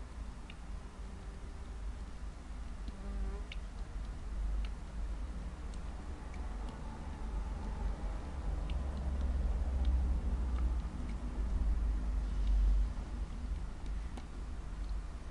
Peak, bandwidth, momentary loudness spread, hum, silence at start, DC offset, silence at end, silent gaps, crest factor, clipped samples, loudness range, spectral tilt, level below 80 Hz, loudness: -22 dBFS; 10.5 kHz; 12 LU; none; 0 s; under 0.1%; 0 s; none; 14 dB; under 0.1%; 9 LU; -7 dB/octave; -38 dBFS; -41 LUFS